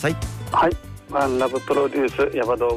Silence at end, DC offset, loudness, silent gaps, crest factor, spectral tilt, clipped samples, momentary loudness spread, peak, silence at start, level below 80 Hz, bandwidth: 0 s; under 0.1%; -22 LUFS; none; 12 dB; -6 dB/octave; under 0.1%; 7 LU; -10 dBFS; 0 s; -40 dBFS; 15.5 kHz